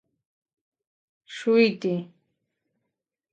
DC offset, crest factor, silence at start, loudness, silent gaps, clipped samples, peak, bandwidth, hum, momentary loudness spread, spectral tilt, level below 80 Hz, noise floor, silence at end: under 0.1%; 20 dB; 1.3 s; -24 LUFS; none; under 0.1%; -8 dBFS; 8.6 kHz; none; 13 LU; -6.5 dB/octave; -80 dBFS; -84 dBFS; 1.3 s